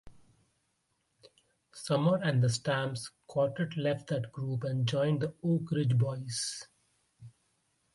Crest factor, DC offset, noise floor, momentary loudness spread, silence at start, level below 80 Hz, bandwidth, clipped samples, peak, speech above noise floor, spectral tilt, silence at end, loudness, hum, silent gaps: 16 dB; under 0.1%; -78 dBFS; 9 LU; 0.05 s; -68 dBFS; 11.5 kHz; under 0.1%; -18 dBFS; 47 dB; -6 dB/octave; 0.65 s; -32 LUFS; none; none